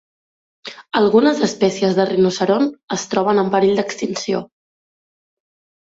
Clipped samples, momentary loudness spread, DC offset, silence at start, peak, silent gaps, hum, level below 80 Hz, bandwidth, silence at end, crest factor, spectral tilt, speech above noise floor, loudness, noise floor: under 0.1%; 11 LU; under 0.1%; 0.65 s; -2 dBFS; 2.83-2.88 s; none; -60 dBFS; 8 kHz; 1.5 s; 16 dB; -5 dB/octave; over 74 dB; -17 LUFS; under -90 dBFS